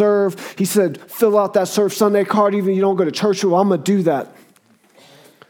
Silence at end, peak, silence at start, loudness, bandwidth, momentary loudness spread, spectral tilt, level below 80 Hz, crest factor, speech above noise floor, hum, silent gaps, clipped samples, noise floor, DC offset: 1.2 s; -2 dBFS; 0 s; -17 LUFS; 19 kHz; 6 LU; -5.5 dB/octave; -72 dBFS; 16 dB; 37 dB; none; none; under 0.1%; -54 dBFS; under 0.1%